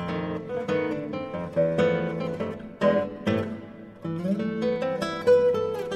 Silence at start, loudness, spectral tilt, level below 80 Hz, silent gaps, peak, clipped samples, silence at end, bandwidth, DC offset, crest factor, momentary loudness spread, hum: 0 s; -26 LUFS; -7 dB/octave; -58 dBFS; none; -10 dBFS; under 0.1%; 0 s; 10.5 kHz; under 0.1%; 16 dB; 12 LU; none